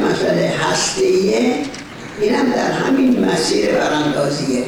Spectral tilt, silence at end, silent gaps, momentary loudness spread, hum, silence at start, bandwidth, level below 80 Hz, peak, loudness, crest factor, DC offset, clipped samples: -4.5 dB/octave; 0 s; none; 6 LU; none; 0 s; 19.5 kHz; -48 dBFS; -6 dBFS; -16 LUFS; 10 dB; under 0.1%; under 0.1%